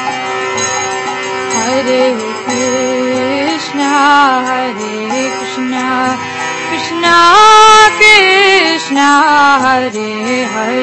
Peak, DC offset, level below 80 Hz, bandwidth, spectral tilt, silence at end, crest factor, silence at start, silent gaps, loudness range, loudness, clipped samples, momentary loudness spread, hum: 0 dBFS; under 0.1%; -50 dBFS; 11 kHz; -2 dB/octave; 0 s; 10 dB; 0 s; none; 8 LU; -9 LUFS; 0.9%; 13 LU; none